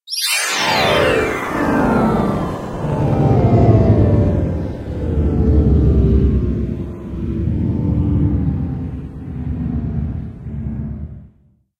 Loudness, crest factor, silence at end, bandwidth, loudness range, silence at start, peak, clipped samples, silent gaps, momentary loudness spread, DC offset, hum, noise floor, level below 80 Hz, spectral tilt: -17 LUFS; 16 dB; 0.5 s; 16 kHz; 7 LU; 0.05 s; -2 dBFS; under 0.1%; none; 14 LU; under 0.1%; none; -54 dBFS; -24 dBFS; -6 dB/octave